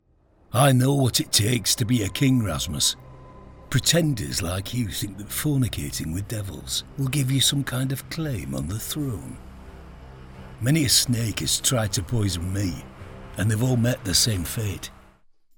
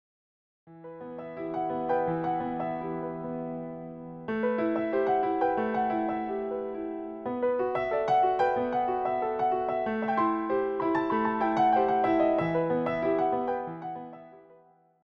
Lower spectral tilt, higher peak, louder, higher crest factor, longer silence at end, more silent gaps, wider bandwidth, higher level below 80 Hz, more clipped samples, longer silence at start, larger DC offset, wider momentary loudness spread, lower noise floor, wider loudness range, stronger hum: second, -4 dB/octave vs -8.5 dB/octave; first, -4 dBFS vs -14 dBFS; first, -23 LUFS vs -28 LUFS; first, 20 dB vs 14 dB; first, 0.65 s vs 0.5 s; neither; first, 19 kHz vs 6.6 kHz; first, -44 dBFS vs -62 dBFS; neither; second, 0.5 s vs 0.65 s; neither; about the same, 12 LU vs 14 LU; about the same, -59 dBFS vs -60 dBFS; about the same, 5 LU vs 6 LU; neither